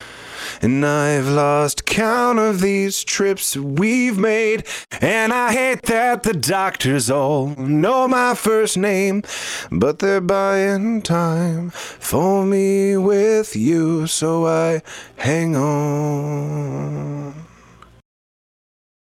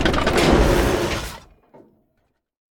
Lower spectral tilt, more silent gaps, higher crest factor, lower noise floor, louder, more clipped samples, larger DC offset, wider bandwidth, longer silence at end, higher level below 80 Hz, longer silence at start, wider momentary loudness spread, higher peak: about the same, -5 dB/octave vs -5 dB/octave; neither; second, 14 dB vs 20 dB; second, -46 dBFS vs -69 dBFS; about the same, -18 LUFS vs -18 LUFS; neither; neither; about the same, 17 kHz vs 18 kHz; first, 1.6 s vs 1.4 s; second, -50 dBFS vs -28 dBFS; about the same, 0 s vs 0 s; second, 9 LU vs 16 LU; about the same, -4 dBFS vs -2 dBFS